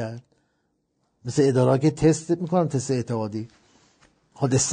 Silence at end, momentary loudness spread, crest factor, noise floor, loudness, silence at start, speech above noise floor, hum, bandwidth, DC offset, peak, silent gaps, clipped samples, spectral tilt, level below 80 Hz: 0 s; 16 LU; 18 dB; -72 dBFS; -23 LUFS; 0 s; 50 dB; none; 9.4 kHz; under 0.1%; -6 dBFS; none; under 0.1%; -6 dB/octave; -52 dBFS